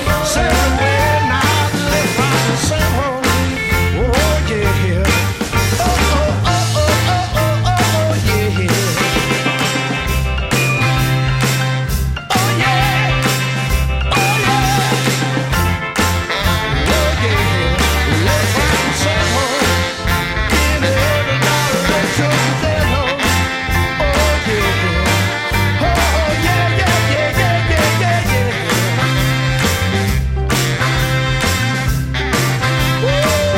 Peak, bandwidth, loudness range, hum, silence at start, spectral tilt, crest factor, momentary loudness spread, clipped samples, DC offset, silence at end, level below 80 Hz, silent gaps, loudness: -2 dBFS; 16.5 kHz; 1 LU; none; 0 s; -4.5 dB/octave; 12 dB; 3 LU; under 0.1%; under 0.1%; 0 s; -24 dBFS; none; -15 LUFS